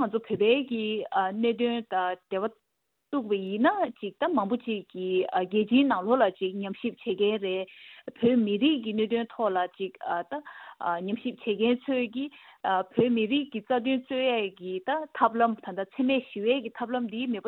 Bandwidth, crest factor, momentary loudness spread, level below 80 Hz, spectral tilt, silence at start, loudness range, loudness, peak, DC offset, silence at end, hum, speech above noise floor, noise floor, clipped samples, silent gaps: 4.2 kHz; 20 dB; 10 LU; -74 dBFS; -8.5 dB/octave; 0 s; 3 LU; -28 LUFS; -8 dBFS; under 0.1%; 0 s; none; 31 dB; -59 dBFS; under 0.1%; none